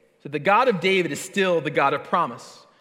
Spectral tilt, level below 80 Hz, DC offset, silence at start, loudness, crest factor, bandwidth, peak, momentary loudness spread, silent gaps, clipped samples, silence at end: -4.5 dB/octave; -78 dBFS; under 0.1%; 0.25 s; -22 LUFS; 16 dB; 16 kHz; -6 dBFS; 9 LU; none; under 0.1%; 0.25 s